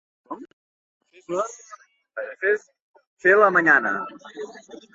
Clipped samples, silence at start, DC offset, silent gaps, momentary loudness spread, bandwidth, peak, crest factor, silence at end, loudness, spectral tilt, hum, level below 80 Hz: under 0.1%; 0.3 s; under 0.1%; 0.53-1.00 s, 2.81-2.94 s, 3.07-3.17 s; 23 LU; 7.8 kHz; -2 dBFS; 22 dB; 0.15 s; -20 LUFS; -5 dB/octave; none; -74 dBFS